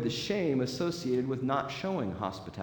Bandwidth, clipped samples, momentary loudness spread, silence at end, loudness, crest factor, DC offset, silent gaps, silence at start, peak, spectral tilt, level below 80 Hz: 19 kHz; under 0.1%; 5 LU; 0 s; -32 LUFS; 16 dB; under 0.1%; none; 0 s; -16 dBFS; -6 dB/octave; -62 dBFS